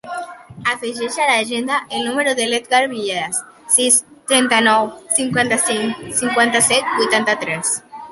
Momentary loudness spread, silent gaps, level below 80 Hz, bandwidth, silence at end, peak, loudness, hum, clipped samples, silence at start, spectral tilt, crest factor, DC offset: 10 LU; none; -60 dBFS; 12 kHz; 0 s; 0 dBFS; -16 LUFS; none; under 0.1%; 0.05 s; -1.5 dB/octave; 18 dB; under 0.1%